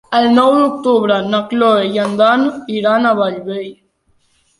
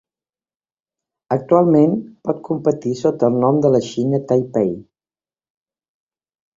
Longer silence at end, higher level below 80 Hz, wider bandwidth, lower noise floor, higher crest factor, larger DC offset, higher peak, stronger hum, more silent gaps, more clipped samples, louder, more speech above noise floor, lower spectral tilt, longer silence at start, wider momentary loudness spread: second, 0.85 s vs 1.75 s; about the same, -58 dBFS vs -60 dBFS; first, 11.5 kHz vs 7.6 kHz; second, -59 dBFS vs under -90 dBFS; second, 12 dB vs 18 dB; neither; about the same, -2 dBFS vs -2 dBFS; neither; neither; neither; first, -13 LUFS vs -17 LUFS; second, 45 dB vs over 73 dB; second, -6 dB/octave vs -8.5 dB/octave; second, 0.1 s vs 1.3 s; about the same, 10 LU vs 10 LU